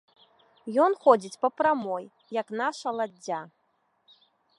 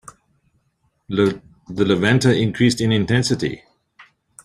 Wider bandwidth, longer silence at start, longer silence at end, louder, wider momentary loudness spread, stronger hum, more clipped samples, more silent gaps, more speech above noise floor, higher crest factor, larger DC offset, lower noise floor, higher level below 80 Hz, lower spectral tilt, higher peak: second, 11.5 kHz vs 13 kHz; second, 0.65 s vs 1.1 s; first, 1.1 s vs 0.45 s; second, -27 LUFS vs -18 LUFS; about the same, 13 LU vs 13 LU; neither; neither; neither; second, 44 dB vs 49 dB; about the same, 22 dB vs 18 dB; neither; about the same, -70 dBFS vs -67 dBFS; second, -78 dBFS vs -52 dBFS; about the same, -4.5 dB/octave vs -5.5 dB/octave; second, -6 dBFS vs -2 dBFS